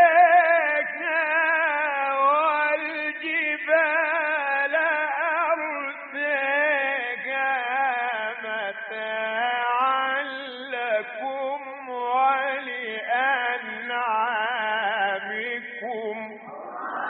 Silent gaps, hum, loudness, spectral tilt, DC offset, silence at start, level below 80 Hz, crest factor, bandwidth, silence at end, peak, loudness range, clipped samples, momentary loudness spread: none; none; -24 LUFS; 1.5 dB/octave; under 0.1%; 0 s; -86 dBFS; 18 dB; 4.3 kHz; 0 s; -6 dBFS; 4 LU; under 0.1%; 11 LU